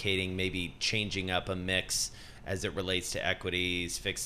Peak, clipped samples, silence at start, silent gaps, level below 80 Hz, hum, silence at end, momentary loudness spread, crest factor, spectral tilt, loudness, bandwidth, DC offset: -14 dBFS; under 0.1%; 0 s; none; -52 dBFS; none; 0 s; 5 LU; 20 dB; -3 dB/octave; -32 LUFS; 15.5 kHz; 0.2%